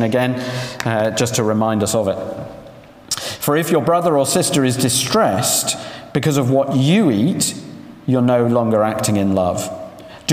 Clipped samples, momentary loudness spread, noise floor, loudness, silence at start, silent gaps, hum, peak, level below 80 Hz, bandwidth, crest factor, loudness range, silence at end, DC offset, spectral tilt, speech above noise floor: under 0.1%; 11 LU; -40 dBFS; -17 LUFS; 0 s; none; none; -2 dBFS; -54 dBFS; 16 kHz; 14 dB; 3 LU; 0 s; under 0.1%; -4.5 dB/octave; 24 dB